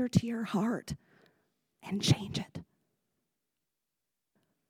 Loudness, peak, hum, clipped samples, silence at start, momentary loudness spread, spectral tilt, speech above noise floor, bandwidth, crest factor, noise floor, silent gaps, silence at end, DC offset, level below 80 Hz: -33 LUFS; -12 dBFS; none; under 0.1%; 0 s; 16 LU; -5.5 dB/octave; 56 dB; 16.5 kHz; 24 dB; -88 dBFS; none; 2.05 s; under 0.1%; -60 dBFS